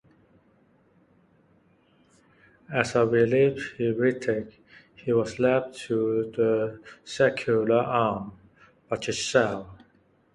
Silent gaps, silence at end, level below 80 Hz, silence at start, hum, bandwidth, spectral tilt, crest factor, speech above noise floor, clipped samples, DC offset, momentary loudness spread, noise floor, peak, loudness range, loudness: none; 0.6 s; -62 dBFS; 2.7 s; none; 11.5 kHz; -5.5 dB/octave; 22 dB; 38 dB; under 0.1%; under 0.1%; 13 LU; -63 dBFS; -4 dBFS; 2 LU; -25 LUFS